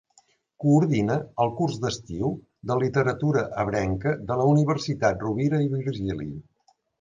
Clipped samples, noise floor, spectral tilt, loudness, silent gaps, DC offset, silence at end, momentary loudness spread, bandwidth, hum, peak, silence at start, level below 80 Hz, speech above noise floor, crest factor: under 0.1%; -63 dBFS; -7 dB/octave; -25 LUFS; none; under 0.1%; 0.6 s; 9 LU; 7.6 kHz; none; -8 dBFS; 0.6 s; -50 dBFS; 39 dB; 18 dB